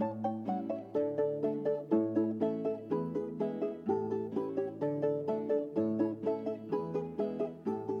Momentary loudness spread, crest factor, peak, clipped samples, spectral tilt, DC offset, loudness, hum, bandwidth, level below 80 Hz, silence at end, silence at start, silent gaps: 5 LU; 16 dB; -18 dBFS; under 0.1%; -10 dB/octave; under 0.1%; -34 LUFS; none; 6.4 kHz; -78 dBFS; 0 s; 0 s; none